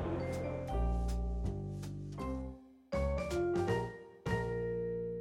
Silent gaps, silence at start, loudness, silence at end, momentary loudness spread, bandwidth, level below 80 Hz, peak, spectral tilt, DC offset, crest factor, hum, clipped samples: none; 0 s; -38 LUFS; 0 s; 9 LU; 13 kHz; -42 dBFS; -22 dBFS; -7.5 dB/octave; under 0.1%; 16 dB; none; under 0.1%